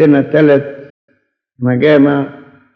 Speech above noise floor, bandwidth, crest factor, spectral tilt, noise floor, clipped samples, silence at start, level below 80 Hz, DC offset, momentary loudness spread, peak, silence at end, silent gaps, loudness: 50 dB; 5.2 kHz; 12 dB; -9.5 dB/octave; -60 dBFS; under 0.1%; 0 s; -66 dBFS; under 0.1%; 13 LU; 0 dBFS; 0.45 s; 0.90-1.08 s; -11 LUFS